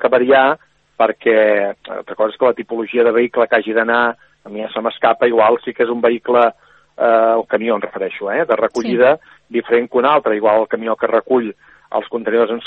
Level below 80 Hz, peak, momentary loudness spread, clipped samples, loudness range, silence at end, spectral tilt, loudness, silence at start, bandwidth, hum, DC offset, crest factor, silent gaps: -64 dBFS; 0 dBFS; 11 LU; under 0.1%; 1 LU; 0 s; -6 dB/octave; -16 LUFS; 0 s; 7.6 kHz; none; under 0.1%; 16 dB; none